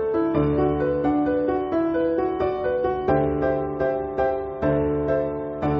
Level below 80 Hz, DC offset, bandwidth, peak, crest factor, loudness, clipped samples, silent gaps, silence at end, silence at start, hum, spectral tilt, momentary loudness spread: -40 dBFS; under 0.1%; 5.6 kHz; -8 dBFS; 14 dB; -23 LUFS; under 0.1%; none; 0 s; 0 s; none; -7.5 dB/octave; 3 LU